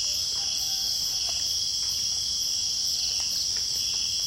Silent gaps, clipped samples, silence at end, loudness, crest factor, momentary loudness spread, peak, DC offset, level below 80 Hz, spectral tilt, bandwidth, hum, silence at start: none; under 0.1%; 0 s; -24 LUFS; 14 dB; 1 LU; -14 dBFS; under 0.1%; -54 dBFS; 1.5 dB/octave; 16.5 kHz; none; 0 s